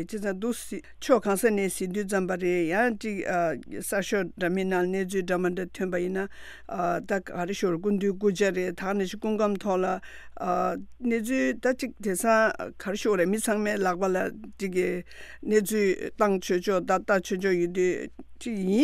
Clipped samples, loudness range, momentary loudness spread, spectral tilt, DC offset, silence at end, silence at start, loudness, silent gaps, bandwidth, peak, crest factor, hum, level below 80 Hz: under 0.1%; 3 LU; 9 LU; -5 dB/octave; under 0.1%; 0 s; 0 s; -27 LUFS; none; 15.5 kHz; -8 dBFS; 18 dB; none; -56 dBFS